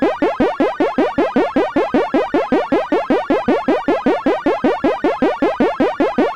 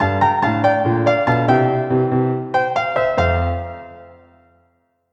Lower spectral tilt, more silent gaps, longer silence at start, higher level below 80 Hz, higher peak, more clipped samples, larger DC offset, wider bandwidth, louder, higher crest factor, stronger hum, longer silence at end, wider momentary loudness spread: second, -6.5 dB/octave vs -8 dB/octave; neither; about the same, 0 s vs 0 s; second, -46 dBFS vs -40 dBFS; about the same, -2 dBFS vs -2 dBFS; neither; first, 0.7% vs under 0.1%; first, 9.6 kHz vs 7.8 kHz; about the same, -17 LUFS vs -17 LUFS; about the same, 14 dB vs 16 dB; neither; second, 0 s vs 1.05 s; second, 1 LU vs 6 LU